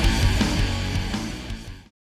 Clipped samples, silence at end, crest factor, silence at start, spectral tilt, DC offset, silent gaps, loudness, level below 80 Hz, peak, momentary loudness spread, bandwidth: under 0.1%; 0.4 s; 16 dB; 0 s; -5 dB/octave; under 0.1%; none; -24 LUFS; -28 dBFS; -8 dBFS; 15 LU; 15 kHz